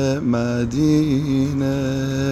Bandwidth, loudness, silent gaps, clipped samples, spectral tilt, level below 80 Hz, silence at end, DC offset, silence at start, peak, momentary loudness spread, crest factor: 13 kHz; -20 LUFS; none; under 0.1%; -7 dB/octave; -40 dBFS; 0 s; under 0.1%; 0 s; -6 dBFS; 4 LU; 12 dB